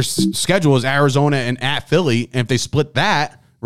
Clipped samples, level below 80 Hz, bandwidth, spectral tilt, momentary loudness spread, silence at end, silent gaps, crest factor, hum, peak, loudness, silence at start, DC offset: under 0.1%; -48 dBFS; 15.5 kHz; -5 dB/octave; 5 LU; 0 s; none; 14 dB; none; -4 dBFS; -17 LUFS; 0 s; 2%